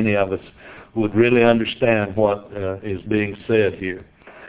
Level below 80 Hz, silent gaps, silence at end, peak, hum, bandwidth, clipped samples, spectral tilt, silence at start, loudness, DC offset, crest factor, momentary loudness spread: -48 dBFS; none; 0 s; 0 dBFS; none; 4 kHz; under 0.1%; -10.5 dB/octave; 0 s; -20 LUFS; under 0.1%; 20 dB; 13 LU